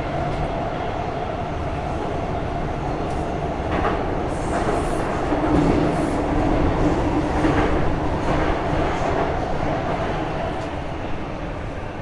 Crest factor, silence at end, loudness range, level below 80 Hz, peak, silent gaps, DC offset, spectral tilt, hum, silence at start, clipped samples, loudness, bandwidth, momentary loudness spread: 16 dB; 0 s; 5 LU; -30 dBFS; -6 dBFS; none; under 0.1%; -7 dB/octave; none; 0 s; under 0.1%; -23 LUFS; 11.5 kHz; 7 LU